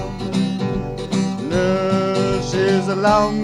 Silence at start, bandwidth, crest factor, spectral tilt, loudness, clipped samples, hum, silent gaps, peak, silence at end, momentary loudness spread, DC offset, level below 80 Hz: 0 s; 11.5 kHz; 16 dB; -6 dB/octave; -19 LUFS; under 0.1%; none; none; -2 dBFS; 0 s; 7 LU; under 0.1%; -38 dBFS